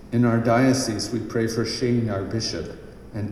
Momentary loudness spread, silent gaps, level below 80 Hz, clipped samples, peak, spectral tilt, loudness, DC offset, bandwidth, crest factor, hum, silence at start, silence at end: 14 LU; none; -46 dBFS; under 0.1%; -6 dBFS; -5.5 dB/octave; -23 LUFS; under 0.1%; 14 kHz; 16 dB; none; 0 s; 0 s